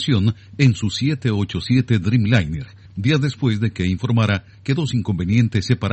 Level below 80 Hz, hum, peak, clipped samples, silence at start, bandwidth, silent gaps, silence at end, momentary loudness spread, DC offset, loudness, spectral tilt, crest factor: -44 dBFS; none; -2 dBFS; under 0.1%; 0 s; 8.6 kHz; none; 0 s; 6 LU; under 0.1%; -20 LUFS; -6.5 dB/octave; 16 dB